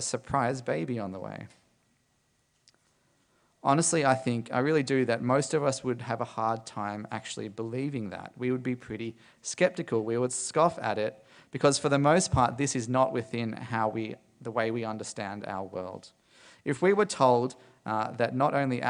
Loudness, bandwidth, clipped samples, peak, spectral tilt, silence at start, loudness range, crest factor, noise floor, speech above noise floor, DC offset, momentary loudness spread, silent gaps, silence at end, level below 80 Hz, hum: -29 LUFS; 10.5 kHz; under 0.1%; -8 dBFS; -5 dB/octave; 0 s; 7 LU; 20 dB; -72 dBFS; 43 dB; under 0.1%; 14 LU; none; 0 s; -58 dBFS; none